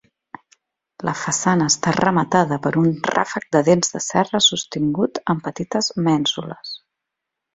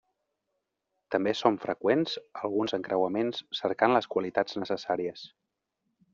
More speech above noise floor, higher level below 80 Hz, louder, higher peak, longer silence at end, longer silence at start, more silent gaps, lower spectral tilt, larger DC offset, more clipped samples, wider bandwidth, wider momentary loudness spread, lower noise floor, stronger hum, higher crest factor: first, 63 dB vs 54 dB; first, -56 dBFS vs -74 dBFS; first, -19 LUFS vs -29 LUFS; first, -2 dBFS vs -8 dBFS; about the same, 0.8 s vs 0.85 s; about the same, 1 s vs 1.1 s; neither; about the same, -4 dB/octave vs -3 dB/octave; neither; neither; first, 8.2 kHz vs 7.4 kHz; first, 11 LU vs 8 LU; about the same, -82 dBFS vs -82 dBFS; neither; about the same, 18 dB vs 22 dB